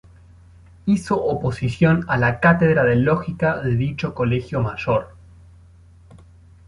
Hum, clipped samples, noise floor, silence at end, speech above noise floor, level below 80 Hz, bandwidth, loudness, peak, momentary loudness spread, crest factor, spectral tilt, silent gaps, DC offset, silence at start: none; under 0.1%; -48 dBFS; 0.5 s; 29 dB; -44 dBFS; 11.5 kHz; -20 LUFS; -2 dBFS; 8 LU; 18 dB; -8 dB/octave; none; under 0.1%; 0.85 s